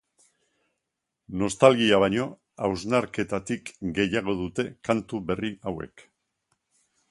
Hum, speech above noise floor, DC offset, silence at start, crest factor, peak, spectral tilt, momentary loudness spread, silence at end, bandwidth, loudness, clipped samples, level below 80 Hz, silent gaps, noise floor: none; 58 dB; under 0.1%; 1.3 s; 26 dB; -2 dBFS; -5 dB/octave; 15 LU; 1.25 s; 11.5 kHz; -26 LUFS; under 0.1%; -54 dBFS; none; -83 dBFS